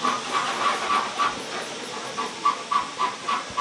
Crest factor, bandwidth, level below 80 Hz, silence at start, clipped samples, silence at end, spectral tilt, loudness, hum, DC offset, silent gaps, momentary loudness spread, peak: 16 dB; 11.5 kHz; -66 dBFS; 0 s; under 0.1%; 0 s; -1.5 dB/octave; -26 LUFS; none; under 0.1%; none; 8 LU; -10 dBFS